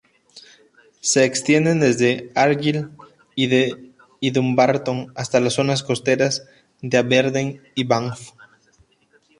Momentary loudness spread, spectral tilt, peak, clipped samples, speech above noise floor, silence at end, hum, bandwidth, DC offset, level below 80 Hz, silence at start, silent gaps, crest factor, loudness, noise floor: 10 LU; -4.5 dB/octave; -2 dBFS; under 0.1%; 41 dB; 1.1 s; none; 11.5 kHz; under 0.1%; -62 dBFS; 0.35 s; none; 18 dB; -19 LUFS; -59 dBFS